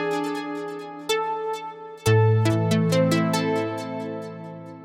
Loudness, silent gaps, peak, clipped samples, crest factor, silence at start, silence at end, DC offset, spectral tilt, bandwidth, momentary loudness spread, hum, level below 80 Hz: -24 LUFS; none; -8 dBFS; under 0.1%; 16 dB; 0 s; 0 s; under 0.1%; -6 dB/octave; 16 kHz; 14 LU; none; -58 dBFS